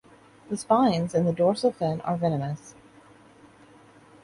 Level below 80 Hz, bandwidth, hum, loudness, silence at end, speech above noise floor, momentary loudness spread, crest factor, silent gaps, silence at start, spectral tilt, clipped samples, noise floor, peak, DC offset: -62 dBFS; 11.5 kHz; none; -25 LUFS; 1.55 s; 29 dB; 13 LU; 20 dB; none; 0.5 s; -7 dB/octave; under 0.1%; -53 dBFS; -8 dBFS; under 0.1%